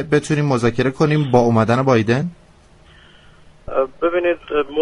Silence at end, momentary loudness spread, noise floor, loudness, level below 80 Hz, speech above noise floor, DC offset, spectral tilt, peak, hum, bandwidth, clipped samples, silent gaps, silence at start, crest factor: 0 s; 7 LU; -48 dBFS; -17 LUFS; -46 dBFS; 31 dB; under 0.1%; -7 dB/octave; 0 dBFS; none; 11 kHz; under 0.1%; none; 0 s; 18 dB